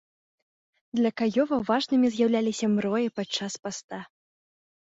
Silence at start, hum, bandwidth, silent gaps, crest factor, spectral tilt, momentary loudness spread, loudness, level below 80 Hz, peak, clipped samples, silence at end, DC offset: 0.95 s; none; 8 kHz; 3.84-3.88 s; 16 dB; -5 dB/octave; 12 LU; -26 LUFS; -68 dBFS; -12 dBFS; under 0.1%; 0.9 s; under 0.1%